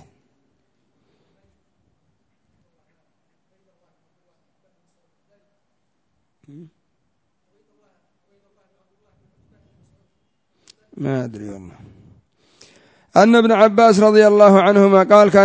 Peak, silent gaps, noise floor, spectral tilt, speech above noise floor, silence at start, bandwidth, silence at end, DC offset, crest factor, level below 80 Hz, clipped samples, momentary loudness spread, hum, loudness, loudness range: 0 dBFS; none; -72 dBFS; -6.5 dB/octave; 59 dB; 10.95 s; 8 kHz; 0 s; under 0.1%; 18 dB; -62 dBFS; under 0.1%; 20 LU; none; -12 LUFS; 20 LU